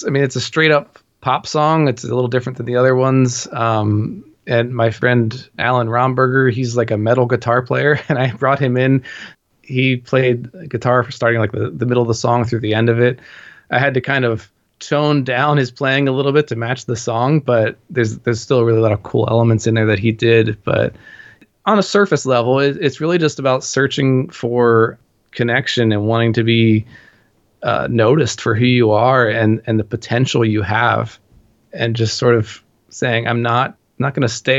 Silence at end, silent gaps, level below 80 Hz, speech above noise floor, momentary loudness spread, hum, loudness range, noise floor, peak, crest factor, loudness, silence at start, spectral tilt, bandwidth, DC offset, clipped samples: 0 s; none; -54 dBFS; 41 dB; 7 LU; none; 2 LU; -56 dBFS; 0 dBFS; 16 dB; -16 LUFS; 0 s; -6 dB/octave; 8 kHz; under 0.1%; under 0.1%